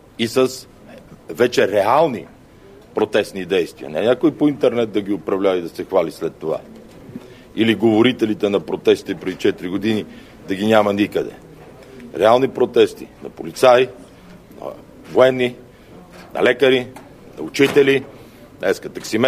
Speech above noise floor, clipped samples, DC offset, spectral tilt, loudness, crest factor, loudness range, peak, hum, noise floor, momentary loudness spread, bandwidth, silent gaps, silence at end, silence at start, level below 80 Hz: 27 dB; under 0.1%; under 0.1%; -5.5 dB/octave; -18 LUFS; 18 dB; 2 LU; 0 dBFS; none; -44 dBFS; 19 LU; 15.5 kHz; none; 0 s; 0.2 s; -54 dBFS